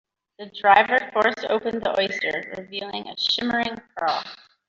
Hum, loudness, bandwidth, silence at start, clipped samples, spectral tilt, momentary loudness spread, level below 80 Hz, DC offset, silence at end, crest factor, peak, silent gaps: none; -22 LUFS; 7.6 kHz; 0.4 s; under 0.1%; -3.5 dB/octave; 15 LU; -62 dBFS; under 0.1%; 0.35 s; 20 dB; -4 dBFS; none